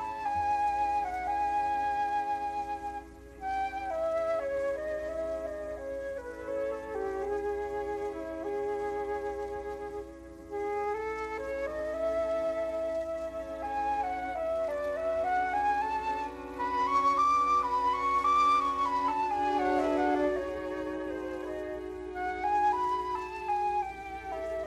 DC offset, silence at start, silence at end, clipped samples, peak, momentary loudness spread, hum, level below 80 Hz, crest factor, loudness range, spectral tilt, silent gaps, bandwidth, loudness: under 0.1%; 0 s; 0 s; under 0.1%; -16 dBFS; 11 LU; none; -54 dBFS; 14 dB; 8 LU; -5 dB/octave; none; 13 kHz; -31 LUFS